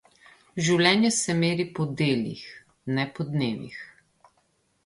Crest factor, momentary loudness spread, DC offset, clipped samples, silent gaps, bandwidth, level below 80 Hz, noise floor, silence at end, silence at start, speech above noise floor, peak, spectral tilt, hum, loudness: 20 dB; 20 LU; under 0.1%; under 0.1%; none; 11.5 kHz; -64 dBFS; -69 dBFS; 0.95 s; 0.55 s; 44 dB; -6 dBFS; -4.5 dB/octave; none; -25 LUFS